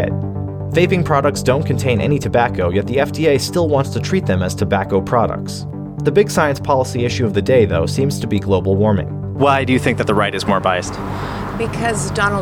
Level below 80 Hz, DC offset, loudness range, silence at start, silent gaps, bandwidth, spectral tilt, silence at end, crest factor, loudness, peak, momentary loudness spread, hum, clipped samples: -38 dBFS; under 0.1%; 2 LU; 0 s; none; 16 kHz; -6 dB/octave; 0 s; 16 dB; -17 LUFS; 0 dBFS; 8 LU; none; under 0.1%